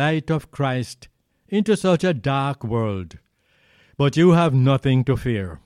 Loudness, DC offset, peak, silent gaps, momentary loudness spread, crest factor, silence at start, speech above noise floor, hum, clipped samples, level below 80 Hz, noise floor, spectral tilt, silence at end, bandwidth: -20 LUFS; under 0.1%; -4 dBFS; none; 11 LU; 16 dB; 0 s; 41 dB; none; under 0.1%; -48 dBFS; -61 dBFS; -7 dB/octave; 0.1 s; 11.5 kHz